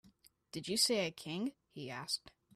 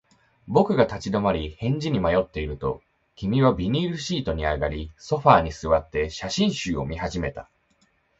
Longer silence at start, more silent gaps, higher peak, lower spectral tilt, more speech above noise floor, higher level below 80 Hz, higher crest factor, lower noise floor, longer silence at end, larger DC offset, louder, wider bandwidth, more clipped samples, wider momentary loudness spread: second, 0.05 s vs 0.45 s; neither; second, -18 dBFS vs 0 dBFS; second, -2.5 dB/octave vs -6 dB/octave; second, 30 dB vs 42 dB; second, -76 dBFS vs -40 dBFS; about the same, 22 dB vs 24 dB; about the same, -68 dBFS vs -65 dBFS; second, 0.25 s vs 0.75 s; neither; second, -37 LUFS vs -24 LUFS; first, 15.5 kHz vs 8 kHz; neither; first, 15 LU vs 11 LU